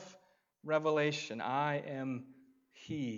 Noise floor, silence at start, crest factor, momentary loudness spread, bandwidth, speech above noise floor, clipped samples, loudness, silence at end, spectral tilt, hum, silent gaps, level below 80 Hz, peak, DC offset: -67 dBFS; 0 s; 20 dB; 18 LU; 7.6 kHz; 32 dB; under 0.1%; -36 LUFS; 0 s; -5.5 dB/octave; none; none; -80 dBFS; -18 dBFS; under 0.1%